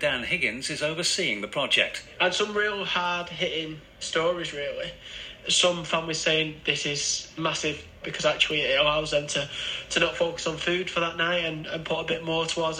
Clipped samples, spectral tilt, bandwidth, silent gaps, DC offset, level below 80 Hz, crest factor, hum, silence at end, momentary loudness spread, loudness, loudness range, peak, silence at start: under 0.1%; -2.5 dB/octave; 14.5 kHz; none; under 0.1%; -54 dBFS; 22 dB; none; 0 s; 9 LU; -26 LUFS; 2 LU; -6 dBFS; 0 s